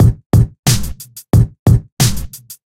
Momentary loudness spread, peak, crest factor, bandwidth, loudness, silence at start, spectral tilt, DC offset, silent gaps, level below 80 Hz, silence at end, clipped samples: 15 LU; 0 dBFS; 14 dB; 16.5 kHz; -14 LUFS; 0 s; -5.5 dB/octave; under 0.1%; 0.26-0.30 s, 0.59-0.63 s, 1.59-1.66 s, 1.92-1.97 s; -24 dBFS; 0.15 s; under 0.1%